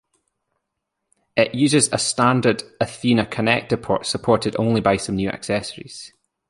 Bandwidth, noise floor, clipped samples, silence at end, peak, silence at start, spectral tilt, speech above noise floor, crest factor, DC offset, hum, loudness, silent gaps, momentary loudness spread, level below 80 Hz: 11.5 kHz; -79 dBFS; under 0.1%; 0.4 s; -2 dBFS; 1.35 s; -4.5 dB/octave; 59 dB; 20 dB; under 0.1%; none; -20 LUFS; none; 9 LU; -50 dBFS